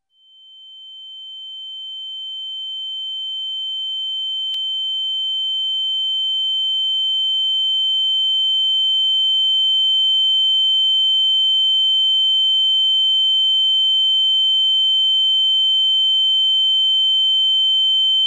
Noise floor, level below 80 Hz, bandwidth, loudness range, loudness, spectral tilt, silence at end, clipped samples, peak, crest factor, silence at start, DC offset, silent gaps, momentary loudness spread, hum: -49 dBFS; under -90 dBFS; 7.4 kHz; 10 LU; -14 LUFS; 8.5 dB/octave; 0 s; under 0.1%; -12 dBFS; 6 dB; 0.55 s; under 0.1%; none; 12 LU; none